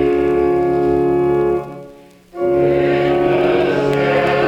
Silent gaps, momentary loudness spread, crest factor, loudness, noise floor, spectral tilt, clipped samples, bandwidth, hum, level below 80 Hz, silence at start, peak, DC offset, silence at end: none; 8 LU; 12 dB; -16 LUFS; -41 dBFS; -7.5 dB/octave; under 0.1%; 7.6 kHz; none; -40 dBFS; 0 s; -4 dBFS; under 0.1%; 0 s